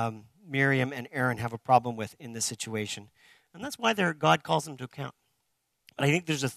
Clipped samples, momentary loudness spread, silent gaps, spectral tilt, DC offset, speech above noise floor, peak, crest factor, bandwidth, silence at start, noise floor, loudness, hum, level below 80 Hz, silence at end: under 0.1%; 15 LU; none; -4.5 dB/octave; under 0.1%; 49 dB; -8 dBFS; 22 dB; 14 kHz; 0 s; -77 dBFS; -28 LUFS; none; -68 dBFS; 0 s